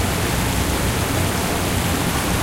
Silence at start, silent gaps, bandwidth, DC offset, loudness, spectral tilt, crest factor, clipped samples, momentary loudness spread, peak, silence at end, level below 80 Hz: 0 s; none; 16 kHz; under 0.1%; -20 LUFS; -4 dB/octave; 12 dB; under 0.1%; 0 LU; -8 dBFS; 0 s; -30 dBFS